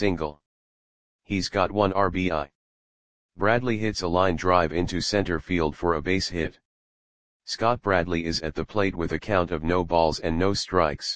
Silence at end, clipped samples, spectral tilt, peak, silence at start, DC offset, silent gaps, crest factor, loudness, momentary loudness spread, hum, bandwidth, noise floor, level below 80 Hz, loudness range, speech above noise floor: 0 s; under 0.1%; -5.5 dB/octave; -4 dBFS; 0 s; 0.9%; 0.46-1.19 s, 2.55-3.29 s, 6.65-7.40 s; 22 dB; -25 LUFS; 8 LU; none; 10 kHz; under -90 dBFS; -44 dBFS; 3 LU; over 66 dB